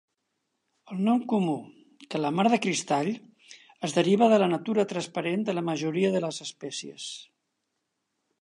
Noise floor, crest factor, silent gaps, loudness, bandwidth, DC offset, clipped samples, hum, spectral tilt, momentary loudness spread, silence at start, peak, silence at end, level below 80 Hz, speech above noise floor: -80 dBFS; 18 dB; none; -27 LUFS; 11.5 kHz; under 0.1%; under 0.1%; none; -5 dB/octave; 15 LU; 0.9 s; -8 dBFS; 1.2 s; -80 dBFS; 54 dB